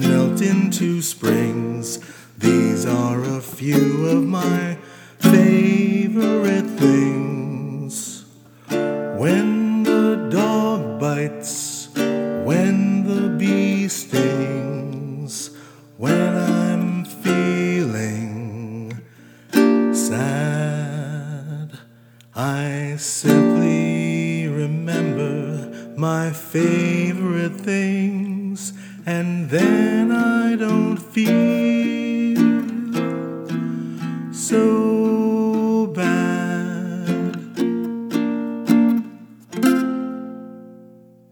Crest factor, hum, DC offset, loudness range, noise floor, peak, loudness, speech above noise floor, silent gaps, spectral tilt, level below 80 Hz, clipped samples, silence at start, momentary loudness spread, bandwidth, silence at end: 18 dB; none; under 0.1%; 4 LU; -48 dBFS; 0 dBFS; -20 LUFS; 31 dB; none; -6 dB/octave; -70 dBFS; under 0.1%; 0 s; 12 LU; over 20 kHz; 0.45 s